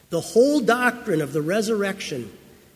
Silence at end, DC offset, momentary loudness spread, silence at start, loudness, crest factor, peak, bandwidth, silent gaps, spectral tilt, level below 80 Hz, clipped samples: 0.4 s; under 0.1%; 12 LU; 0.1 s; -22 LUFS; 18 dB; -4 dBFS; 16 kHz; none; -5 dB/octave; -60 dBFS; under 0.1%